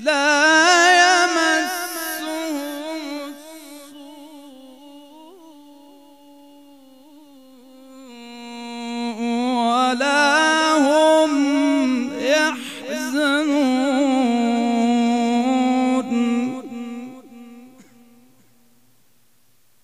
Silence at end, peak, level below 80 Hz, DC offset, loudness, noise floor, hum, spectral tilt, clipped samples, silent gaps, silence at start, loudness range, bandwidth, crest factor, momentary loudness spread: 2.15 s; -2 dBFS; -78 dBFS; 0.2%; -18 LUFS; -62 dBFS; none; -2 dB/octave; under 0.1%; none; 0 s; 18 LU; 15.5 kHz; 18 dB; 21 LU